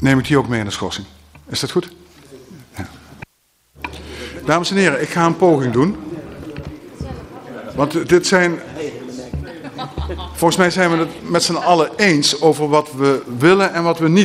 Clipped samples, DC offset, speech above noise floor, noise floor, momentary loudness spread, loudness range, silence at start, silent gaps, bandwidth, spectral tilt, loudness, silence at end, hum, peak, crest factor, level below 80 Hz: under 0.1%; under 0.1%; 45 dB; -61 dBFS; 19 LU; 10 LU; 0 s; none; 16 kHz; -5 dB/octave; -16 LUFS; 0 s; none; 0 dBFS; 18 dB; -40 dBFS